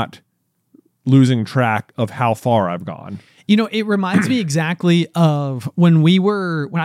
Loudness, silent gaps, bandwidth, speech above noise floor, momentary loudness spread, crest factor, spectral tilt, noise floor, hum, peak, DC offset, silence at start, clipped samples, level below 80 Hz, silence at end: -16 LUFS; none; 13 kHz; 40 dB; 14 LU; 14 dB; -7 dB/octave; -57 dBFS; none; -2 dBFS; under 0.1%; 0 s; under 0.1%; -68 dBFS; 0 s